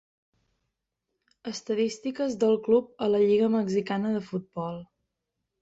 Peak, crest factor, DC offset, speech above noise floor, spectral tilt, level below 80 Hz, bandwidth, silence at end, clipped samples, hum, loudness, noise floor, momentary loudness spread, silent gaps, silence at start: -12 dBFS; 16 dB; under 0.1%; 57 dB; -6 dB/octave; -70 dBFS; 8 kHz; 0.75 s; under 0.1%; none; -27 LUFS; -83 dBFS; 14 LU; none; 1.45 s